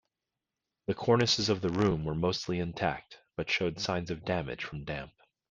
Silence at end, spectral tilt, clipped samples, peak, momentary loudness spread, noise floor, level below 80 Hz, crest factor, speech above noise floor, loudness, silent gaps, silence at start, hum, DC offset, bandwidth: 0.45 s; -5 dB/octave; under 0.1%; -10 dBFS; 13 LU; -89 dBFS; -56 dBFS; 22 dB; 58 dB; -31 LUFS; none; 0.9 s; none; under 0.1%; 9.4 kHz